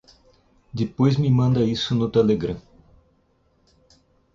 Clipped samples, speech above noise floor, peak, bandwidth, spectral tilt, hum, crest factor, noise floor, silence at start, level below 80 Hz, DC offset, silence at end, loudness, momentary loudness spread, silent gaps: under 0.1%; 43 dB; -6 dBFS; 7.4 kHz; -8 dB/octave; none; 16 dB; -63 dBFS; 0.75 s; -50 dBFS; under 0.1%; 1.75 s; -21 LUFS; 11 LU; none